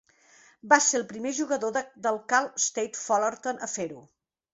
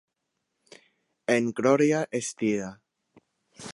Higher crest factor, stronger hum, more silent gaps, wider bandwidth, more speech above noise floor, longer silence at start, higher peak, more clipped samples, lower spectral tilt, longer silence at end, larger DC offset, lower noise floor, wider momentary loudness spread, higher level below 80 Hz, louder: first, 26 dB vs 20 dB; neither; neither; second, 8.2 kHz vs 11.5 kHz; second, 31 dB vs 56 dB; second, 0.65 s vs 1.3 s; first, -4 dBFS vs -8 dBFS; neither; second, -1.5 dB/octave vs -5 dB/octave; first, 0.55 s vs 0 s; neither; second, -58 dBFS vs -81 dBFS; second, 11 LU vs 15 LU; about the same, -74 dBFS vs -72 dBFS; about the same, -26 LUFS vs -26 LUFS